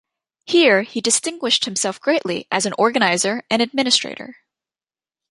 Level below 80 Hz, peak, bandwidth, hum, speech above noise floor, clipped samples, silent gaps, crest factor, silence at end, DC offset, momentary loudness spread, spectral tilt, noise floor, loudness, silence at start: -68 dBFS; 0 dBFS; 11.5 kHz; none; over 71 dB; under 0.1%; none; 20 dB; 1 s; under 0.1%; 6 LU; -2 dB/octave; under -90 dBFS; -18 LUFS; 0.45 s